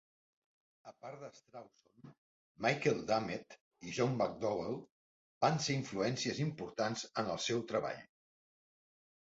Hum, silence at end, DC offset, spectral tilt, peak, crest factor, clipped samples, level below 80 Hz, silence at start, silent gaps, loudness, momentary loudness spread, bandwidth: none; 1.35 s; under 0.1%; -4.5 dB/octave; -18 dBFS; 22 dB; under 0.1%; -72 dBFS; 0.85 s; 2.18-2.55 s, 3.61-3.71 s, 4.91-5.41 s; -37 LUFS; 18 LU; 8 kHz